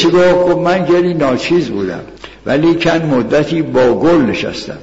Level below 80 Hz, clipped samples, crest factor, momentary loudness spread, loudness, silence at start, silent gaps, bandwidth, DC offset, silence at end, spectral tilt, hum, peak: -40 dBFS; under 0.1%; 10 dB; 11 LU; -12 LUFS; 0 s; none; 8 kHz; under 0.1%; 0 s; -6.5 dB/octave; none; -2 dBFS